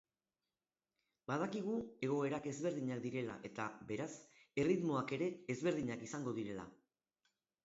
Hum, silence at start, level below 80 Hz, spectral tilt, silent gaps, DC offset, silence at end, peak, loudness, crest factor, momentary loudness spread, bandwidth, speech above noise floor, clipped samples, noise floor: none; 1.3 s; -76 dBFS; -6 dB/octave; none; under 0.1%; 0.9 s; -24 dBFS; -41 LUFS; 18 dB; 9 LU; 7.6 kHz; over 50 dB; under 0.1%; under -90 dBFS